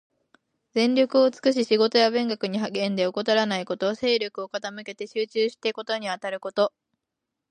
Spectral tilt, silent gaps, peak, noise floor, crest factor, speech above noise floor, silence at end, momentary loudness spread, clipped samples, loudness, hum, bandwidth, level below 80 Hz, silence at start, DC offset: -4.5 dB/octave; none; -6 dBFS; -84 dBFS; 18 dB; 60 dB; 0.8 s; 10 LU; under 0.1%; -24 LUFS; none; 9.8 kHz; -74 dBFS; 0.75 s; under 0.1%